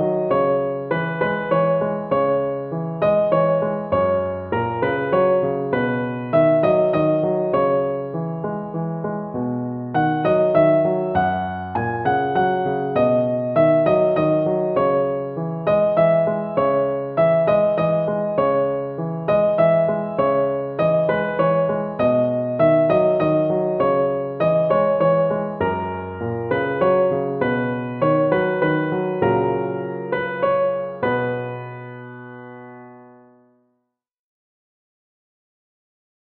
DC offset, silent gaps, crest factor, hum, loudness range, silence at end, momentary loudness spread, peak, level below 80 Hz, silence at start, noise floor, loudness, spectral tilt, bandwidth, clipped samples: under 0.1%; none; 16 dB; none; 4 LU; 3.35 s; 9 LU; -4 dBFS; -54 dBFS; 0 s; -74 dBFS; -20 LUFS; -6.5 dB/octave; 4.7 kHz; under 0.1%